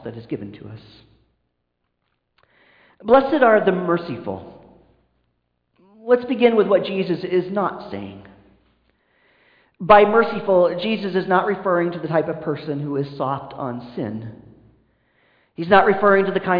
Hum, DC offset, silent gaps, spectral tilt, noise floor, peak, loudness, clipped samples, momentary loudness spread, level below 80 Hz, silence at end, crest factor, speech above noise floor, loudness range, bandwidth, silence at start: none; under 0.1%; none; -9 dB/octave; -74 dBFS; -2 dBFS; -19 LUFS; under 0.1%; 19 LU; -58 dBFS; 0 s; 18 dB; 55 dB; 7 LU; 5.2 kHz; 0.05 s